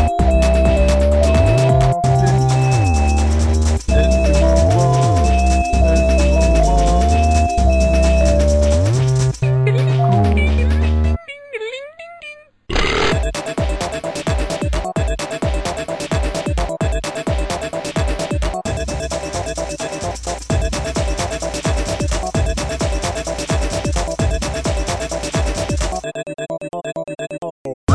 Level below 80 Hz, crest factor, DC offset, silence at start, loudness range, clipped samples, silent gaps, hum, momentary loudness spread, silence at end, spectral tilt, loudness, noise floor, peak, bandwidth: -20 dBFS; 14 dB; under 0.1%; 0 s; 7 LU; under 0.1%; 27.51-27.65 s, 27.74-27.87 s; none; 11 LU; 0 s; -6 dB/octave; -17 LUFS; -38 dBFS; -2 dBFS; 11 kHz